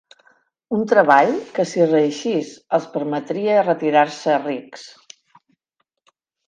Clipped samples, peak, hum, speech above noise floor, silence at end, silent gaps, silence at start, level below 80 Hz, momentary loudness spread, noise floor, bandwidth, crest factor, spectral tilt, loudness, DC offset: under 0.1%; 0 dBFS; none; 55 dB; 1.6 s; none; 0.7 s; -72 dBFS; 13 LU; -74 dBFS; 9.6 kHz; 20 dB; -5.5 dB/octave; -19 LUFS; under 0.1%